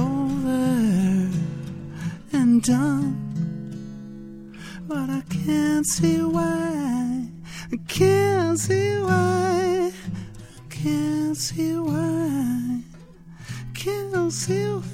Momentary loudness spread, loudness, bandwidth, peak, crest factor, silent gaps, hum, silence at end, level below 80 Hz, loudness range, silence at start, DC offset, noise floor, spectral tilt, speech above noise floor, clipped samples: 16 LU; -23 LUFS; 16.5 kHz; -6 dBFS; 16 dB; none; none; 0 s; -50 dBFS; 4 LU; 0 s; under 0.1%; -44 dBFS; -5.5 dB/octave; 22 dB; under 0.1%